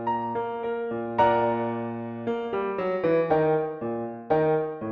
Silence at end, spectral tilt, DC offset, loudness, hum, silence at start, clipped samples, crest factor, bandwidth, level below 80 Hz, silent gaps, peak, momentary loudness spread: 0 s; -9 dB/octave; under 0.1%; -26 LUFS; none; 0 s; under 0.1%; 18 dB; 5.6 kHz; -60 dBFS; none; -8 dBFS; 9 LU